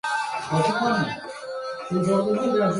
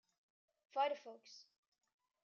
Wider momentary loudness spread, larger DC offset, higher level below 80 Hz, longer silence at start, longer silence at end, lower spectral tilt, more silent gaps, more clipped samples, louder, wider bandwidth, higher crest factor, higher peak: second, 11 LU vs 20 LU; neither; first, -60 dBFS vs under -90 dBFS; second, 0.05 s vs 0.75 s; second, 0 s vs 0.85 s; first, -6 dB/octave vs 2 dB/octave; neither; neither; first, -24 LUFS vs -42 LUFS; first, 11.5 kHz vs 7.2 kHz; second, 14 dB vs 22 dB; first, -10 dBFS vs -26 dBFS